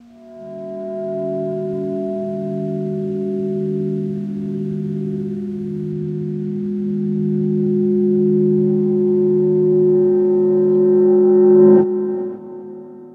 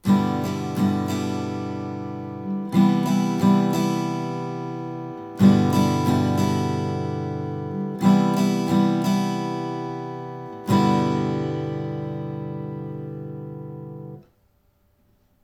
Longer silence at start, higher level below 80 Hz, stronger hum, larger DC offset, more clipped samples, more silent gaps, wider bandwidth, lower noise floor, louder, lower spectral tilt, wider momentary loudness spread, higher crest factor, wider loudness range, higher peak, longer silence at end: first, 0.2 s vs 0.05 s; about the same, -60 dBFS vs -64 dBFS; neither; neither; neither; neither; second, 2.1 kHz vs 15 kHz; second, -37 dBFS vs -63 dBFS; first, -17 LUFS vs -23 LUFS; first, -12 dB/octave vs -7 dB/octave; about the same, 13 LU vs 15 LU; about the same, 16 dB vs 18 dB; about the same, 10 LU vs 9 LU; about the same, -2 dBFS vs -4 dBFS; second, 0 s vs 1.2 s